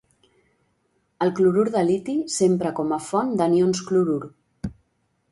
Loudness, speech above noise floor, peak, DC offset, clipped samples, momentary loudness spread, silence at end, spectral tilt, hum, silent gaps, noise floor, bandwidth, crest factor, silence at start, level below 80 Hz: -22 LUFS; 49 dB; -8 dBFS; under 0.1%; under 0.1%; 17 LU; 0.6 s; -6 dB/octave; none; none; -70 dBFS; 11.5 kHz; 16 dB; 1.2 s; -56 dBFS